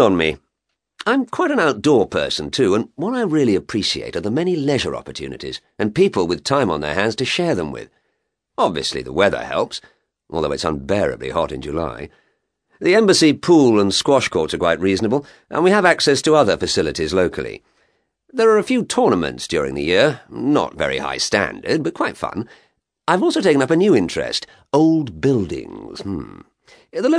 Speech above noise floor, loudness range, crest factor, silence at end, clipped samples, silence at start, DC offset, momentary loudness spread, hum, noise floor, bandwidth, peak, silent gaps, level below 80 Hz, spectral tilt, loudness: 59 dB; 6 LU; 18 dB; 0 s; under 0.1%; 0 s; under 0.1%; 14 LU; none; -77 dBFS; 11 kHz; 0 dBFS; none; -46 dBFS; -4.5 dB/octave; -18 LUFS